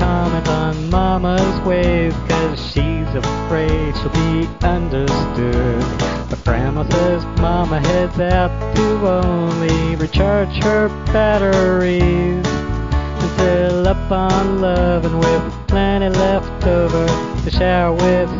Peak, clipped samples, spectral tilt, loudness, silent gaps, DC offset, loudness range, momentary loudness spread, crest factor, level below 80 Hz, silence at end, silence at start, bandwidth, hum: -2 dBFS; under 0.1%; -6.5 dB/octave; -17 LUFS; none; 0.4%; 2 LU; 5 LU; 14 dB; -24 dBFS; 0 s; 0 s; 7.6 kHz; none